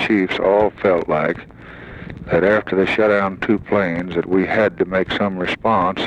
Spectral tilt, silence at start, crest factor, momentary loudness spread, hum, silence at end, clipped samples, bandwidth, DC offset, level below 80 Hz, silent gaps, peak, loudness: -7 dB/octave; 0 s; 14 dB; 15 LU; none; 0 s; under 0.1%; 9 kHz; under 0.1%; -46 dBFS; none; -4 dBFS; -18 LUFS